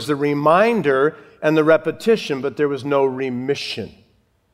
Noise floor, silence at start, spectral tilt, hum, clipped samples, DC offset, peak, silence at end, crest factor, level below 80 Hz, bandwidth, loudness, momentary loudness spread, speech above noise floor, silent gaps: -60 dBFS; 0 s; -6 dB/octave; none; under 0.1%; under 0.1%; -2 dBFS; 0.65 s; 18 dB; -64 dBFS; 14 kHz; -18 LUFS; 9 LU; 42 dB; none